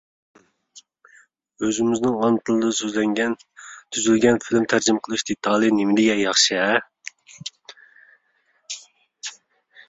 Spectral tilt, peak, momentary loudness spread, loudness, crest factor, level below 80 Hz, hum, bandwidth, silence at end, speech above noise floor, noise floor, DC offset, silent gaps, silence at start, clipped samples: -3 dB/octave; -2 dBFS; 19 LU; -20 LUFS; 22 dB; -62 dBFS; none; 8 kHz; 0.55 s; 46 dB; -66 dBFS; under 0.1%; none; 0.75 s; under 0.1%